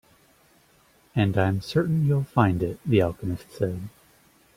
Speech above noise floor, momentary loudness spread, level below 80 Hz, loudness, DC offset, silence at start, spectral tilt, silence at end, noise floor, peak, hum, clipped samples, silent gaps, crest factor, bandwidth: 36 dB; 10 LU; -52 dBFS; -25 LUFS; under 0.1%; 1.15 s; -8 dB/octave; 0.65 s; -60 dBFS; -6 dBFS; none; under 0.1%; none; 20 dB; 15.5 kHz